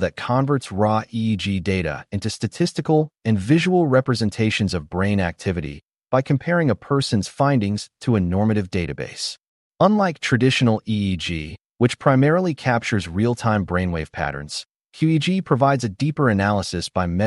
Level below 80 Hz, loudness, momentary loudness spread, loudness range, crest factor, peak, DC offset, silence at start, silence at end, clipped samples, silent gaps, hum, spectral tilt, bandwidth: -46 dBFS; -21 LUFS; 10 LU; 2 LU; 16 dB; -4 dBFS; under 0.1%; 0 s; 0 s; under 0.1%; 5.85-5.89 s, 9.48-9.71 s, 11.66-11.70 s; none; -6 dB/octave; 11.5 kHz